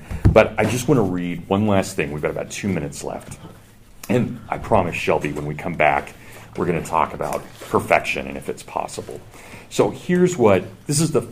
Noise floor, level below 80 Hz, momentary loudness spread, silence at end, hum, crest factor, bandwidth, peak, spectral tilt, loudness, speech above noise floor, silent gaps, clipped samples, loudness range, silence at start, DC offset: -45 dBFS; -38 dBFS; 17 LU; 0 s; none; 20 dB; 15.5 kHz; 0 dBFS; -5.5 dB/octave; -21 LUFS; 24 dB; none; under 0.1%; 3 LU; 0 s; under 0.1%